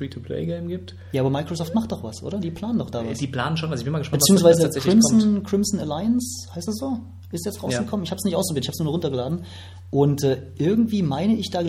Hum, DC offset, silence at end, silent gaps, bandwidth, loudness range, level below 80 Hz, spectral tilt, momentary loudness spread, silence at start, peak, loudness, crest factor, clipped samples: none; under 0.1%; 0 s; none; 16 kHz; 7 LU; -52 dBFS; -5.5 dB/octave; 14 LU; 0 s; -4 dBFS; -22 LUFS; 18 dB; under 0.1%